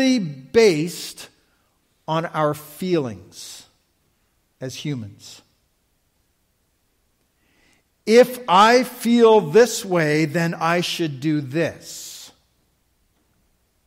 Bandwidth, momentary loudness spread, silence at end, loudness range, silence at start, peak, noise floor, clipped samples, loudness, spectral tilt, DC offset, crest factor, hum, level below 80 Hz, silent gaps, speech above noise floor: 16 kHz; 22 LU; 1.6 s; 20 LU; 0 s; -2 dBFS; -67 dBFS; under 0.1%; -19 LUFS; -5 dB/octave; under 0.1%; 18 dB; none; -64 dBFS; none; 48 dB